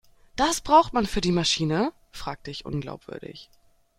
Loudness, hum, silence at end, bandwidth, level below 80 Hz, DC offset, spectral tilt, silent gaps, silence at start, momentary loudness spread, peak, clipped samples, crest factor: -24 LUFS; none; 0.55 s; 16 kHz; -44 dBFS; under 0.1%; -4 dB/octave; none; 0.35 s; 20 LU; -6 dBFS; under 0.1%; 20 dB